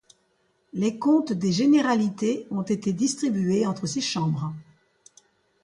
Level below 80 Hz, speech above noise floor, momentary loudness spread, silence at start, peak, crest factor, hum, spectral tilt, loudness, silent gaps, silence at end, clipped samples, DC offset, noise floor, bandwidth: -66 dBFS; 45 dB; 9 LU; 0.75 s; -10 dBFS; 14 dB; none; -5.5 dB/octave; -24 LUFS; none; 1 s; under 0.1%; under 0.1%; -68 dBFS; 11.5 kHz